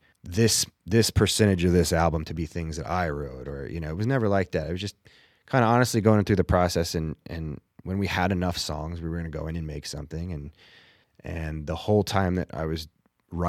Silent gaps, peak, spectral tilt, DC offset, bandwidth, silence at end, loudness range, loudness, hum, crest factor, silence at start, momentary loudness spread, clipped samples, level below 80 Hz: none; -6 dBFS; -5 dB/octave; under 0.1%; 16 kHz; 0 s; 7 LU; -26 LUFS; none; 20 dB; 0.25 s; 14 LU; under 0.1%; -42 dBFS